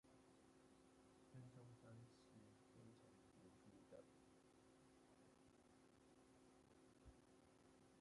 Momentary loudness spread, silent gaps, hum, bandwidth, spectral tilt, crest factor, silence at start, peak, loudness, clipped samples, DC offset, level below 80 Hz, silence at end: 5 LU; none; none; 11 kHz; -6 dB/octave; 18 dB; 0.05 s; -52 dBFS; -67 LUFS; under 0.1%; under 0.1%; -84 dBFS; 0 s